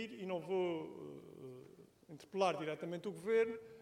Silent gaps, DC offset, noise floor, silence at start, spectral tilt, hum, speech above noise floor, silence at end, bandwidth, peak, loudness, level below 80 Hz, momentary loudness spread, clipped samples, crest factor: none; under 0.1%; -61 dBFS; 0 s; -6 dB/octave; none; 21 dB; 0 s; 14.5 kHz; -22 dBFS; -39 LUFS; -82 dBFS; 19 LU; under 0.1%; 20 dB